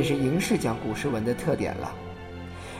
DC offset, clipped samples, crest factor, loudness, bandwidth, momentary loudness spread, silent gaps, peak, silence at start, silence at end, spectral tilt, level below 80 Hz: under 0.1%; under 0.1%; 16 dB; -27 LUFS; 16 kHz; 15 LU; none; -12 dBFS; 0 s; 0 s; -6 dB/octave; -50 dBFS